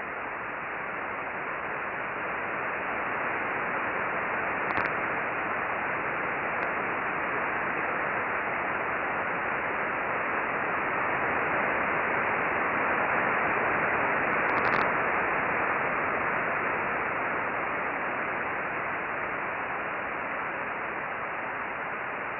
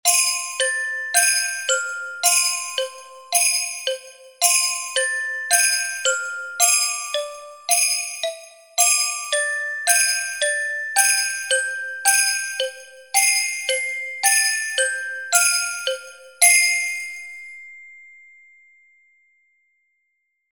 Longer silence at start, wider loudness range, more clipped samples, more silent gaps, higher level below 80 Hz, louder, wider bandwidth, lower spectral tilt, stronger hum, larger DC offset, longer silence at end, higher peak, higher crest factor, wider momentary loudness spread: about the same, 0 s vs 0.05 s; first, 5 LU vs 2 LU; neither; neither; first, -60 dBFS vs -76 dBFS; second, -29 LUFS vs -18 LUFS; second, 6 kHz vs 17 kHz; first, -8 dB/octave vs 5.5 dB/octave; neither; neither; second, 0 s vs 2.45 s; second, -14 dBFS vs 0 dBFS; second, 16 dB vs 22 dB; second, 7 LU vs 12 LU